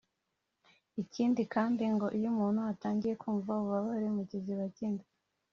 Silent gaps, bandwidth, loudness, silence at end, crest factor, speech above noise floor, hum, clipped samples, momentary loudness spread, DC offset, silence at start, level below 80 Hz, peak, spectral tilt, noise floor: none; 6.8 kHz; -34 LUFS; 0.5 s; 18 dB; 51 dB; none; under 0.1%; 7 LU; under 0.1%; 0.95 s; -74 dBFS; -16 dBFS; -7.5 dB/octave; -84 dBFS